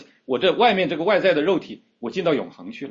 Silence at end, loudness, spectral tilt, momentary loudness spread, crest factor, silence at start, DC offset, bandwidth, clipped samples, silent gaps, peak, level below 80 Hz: 0 s; -21 LUFS; -6 dB/octave; 17 LU; 16 dB; 0 s; under 0.1%; 7.4 kHz; under 0.1%; none; -6 dBFS; -64 dBFS